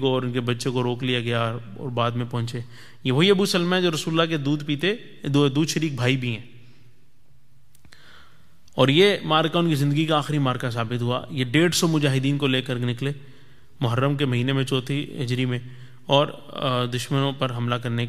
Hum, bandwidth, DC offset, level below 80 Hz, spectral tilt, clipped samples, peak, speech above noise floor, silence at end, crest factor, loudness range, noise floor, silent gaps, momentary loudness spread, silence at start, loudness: none; 15 kHz; 0.8%; -62 dBFS; -5.5 dB/octave; under 0.1%; -4 dBFS; 38 dB; 0 s; 20 dB; 4 LU; -60 dBFS; none; 10 LU; 0 s; -23 LUFS